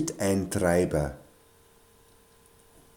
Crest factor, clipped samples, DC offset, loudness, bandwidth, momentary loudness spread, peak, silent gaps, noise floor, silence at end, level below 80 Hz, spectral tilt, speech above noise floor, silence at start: 20 dB; under 0.1%; under 0.1%; -27 LUFS; 19 kHz; 10 LU; -10 dBFS; none; -59 dBFS; 1.75 s; -48 dBFS; -5.5 dB/octave; 32 dB; 0 s